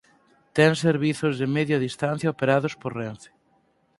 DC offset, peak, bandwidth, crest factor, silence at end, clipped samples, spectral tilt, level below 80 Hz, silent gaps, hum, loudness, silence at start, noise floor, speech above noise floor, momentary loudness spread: under 0.1%; -2 dBFS; 11.5 kHz; 22 dB; 0.75 s; under 0.1%; -6 dB/octave; -64 dBFS; none; none; -24 LUFS; 0.55 s; -65 dBFS; 42 dB; 12 LU